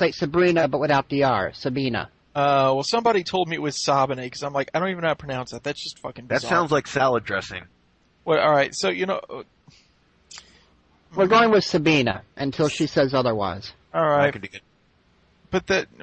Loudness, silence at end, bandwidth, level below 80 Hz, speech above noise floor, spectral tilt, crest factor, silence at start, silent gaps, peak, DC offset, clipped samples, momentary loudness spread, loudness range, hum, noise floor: -22 LUFS; 0.2 s; 8.8 kHz; -56 dBFS; 40 dB; -5 dB/octave; 16 dB; 0 s; none; -6 dBFS; under 0.1%; under 0.1%; 13 LU; 4 LU; none; -61 dBFS